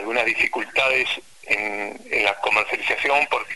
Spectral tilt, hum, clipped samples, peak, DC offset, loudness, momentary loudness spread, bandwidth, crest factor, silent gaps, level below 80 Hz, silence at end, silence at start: -2 dB/octave; none; under 0.1%; -4 dBFS; 0.4%; -21 LUFS; 6 LU; 12 kHz; 18 dB; none; -58 dBFS; 0 s; 0 s